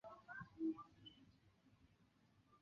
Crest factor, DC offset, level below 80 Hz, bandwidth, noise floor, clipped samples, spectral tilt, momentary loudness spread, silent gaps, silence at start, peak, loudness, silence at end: 18 dB; under 0.1%; -82 dBFS; 6.8 kHz; -76 dBFS; under 0.1%; -4.5 dB/octave; 16 LU; none; 0.05 s; -36 dBFS; -50 LUFS; 0.05 s